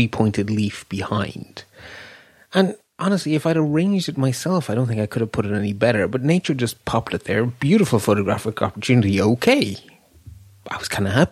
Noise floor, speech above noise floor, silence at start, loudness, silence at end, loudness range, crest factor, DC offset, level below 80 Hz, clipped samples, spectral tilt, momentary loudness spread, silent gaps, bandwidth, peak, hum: -46 dBFS; 26 dB; 0 s; -20 LUFS; 0 s; 4 LU; 18 dB; under 0.1%; -52 dBFS; under 0.1%; -6 dB/octave; 12 LU; none; 15 kHz; -2 dBFS; none